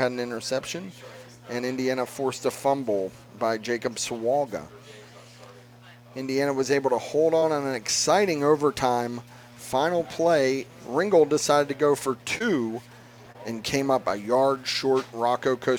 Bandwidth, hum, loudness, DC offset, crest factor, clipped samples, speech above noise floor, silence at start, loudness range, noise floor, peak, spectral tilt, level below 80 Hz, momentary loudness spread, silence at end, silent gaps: 20 kHz; none; -25 LUFS; under 0.1%; 20 dB; under 0.1%; 25 dB; 0 s; 5 LU; -49 dBFS; -6 dBFS; -4 dB/octave; -62 dBFS; 14 LU; 0 s; none